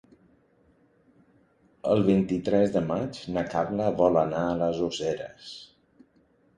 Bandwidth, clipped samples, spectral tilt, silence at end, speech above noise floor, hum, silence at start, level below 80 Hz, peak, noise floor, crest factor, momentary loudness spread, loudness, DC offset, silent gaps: 10 kHz; under 0.1%; -7 dB/octave; 0.95 s; 38 dB; none; 1.85 s; -56 dBFS; -8 dBFS; -64 dBFS; 20 dB; 13 LU; -26 LUFS; under 0.1%; none